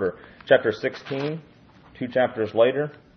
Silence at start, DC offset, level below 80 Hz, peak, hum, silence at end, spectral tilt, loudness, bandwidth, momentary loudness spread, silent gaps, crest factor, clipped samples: 0 s; under 0.1%; -64 dBFS; -4 dBFS; none; 0.25 s; -7 dB/octave; -23 LUFS; 6.4 kHz; 13 LU; none; 22 dB; under 0.1%